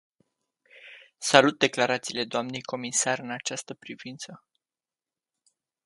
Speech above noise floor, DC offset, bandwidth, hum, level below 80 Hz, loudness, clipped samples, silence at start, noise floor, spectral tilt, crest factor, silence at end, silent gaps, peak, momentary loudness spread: over 63 dB; under 0.1%; 11.5 kHz; none; -76 dBFS; -25 LUFS; under 0.1%; 0.85 s; under -90 dBFS; -2.5 dB/octave; 28 dB; 1.5 s; none; 0 dBFS; 21 LU